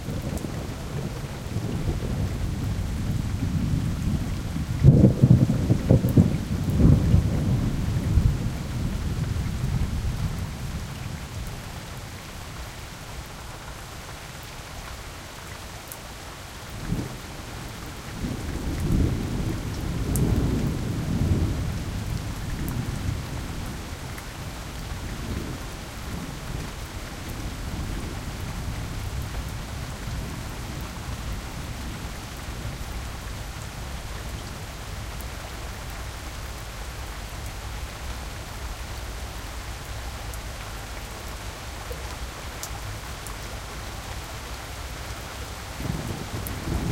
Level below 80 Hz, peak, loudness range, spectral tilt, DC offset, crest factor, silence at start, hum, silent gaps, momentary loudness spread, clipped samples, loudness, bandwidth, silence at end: -34 dBFS; -2 dBFS; 14 LU; -6 dB/octave; under 0.1%; 24 dB; 0 s; none; none; 14 LU; under 0.1%; -29 LUFS; 17 kHz; 0 s